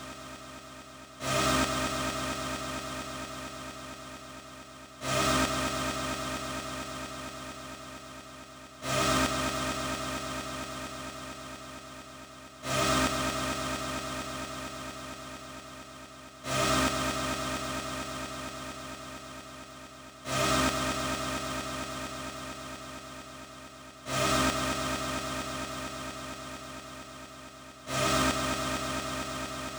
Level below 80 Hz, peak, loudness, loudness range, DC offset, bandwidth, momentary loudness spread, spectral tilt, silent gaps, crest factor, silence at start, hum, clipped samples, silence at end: -50 dBFS; -14 dBFS; -32 LUFS; 4 LU; under 0.1%; over 20 kHz; 19 LU; -3 dB/octave; none; 20 dB; 0 s; none; under 0.1%; 0 s